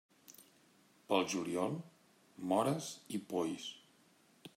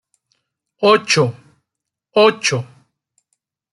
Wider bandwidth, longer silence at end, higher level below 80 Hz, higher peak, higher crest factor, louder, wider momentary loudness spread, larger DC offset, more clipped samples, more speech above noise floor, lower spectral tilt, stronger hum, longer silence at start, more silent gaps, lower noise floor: first, 16 kHz vs 11.5 kHz; second, 0.1 s vs 1.1 s; second, -86 dBFS vs -64 dBFS; second, -18 dBFS vs -2 dBFS; about the same, 22 dB vs 18 dB; second, -38 LUFS vs -16 LUFS; first, 24 LU vs 10 LU; neither; neither; second, 32 dB vs 67 dB; about the same, -4.5 dB/octave vs -4 dB/octave; neither; second, 0.3 s vs 0.8 s; neither; second, -68 dBFS vs -81 dBFS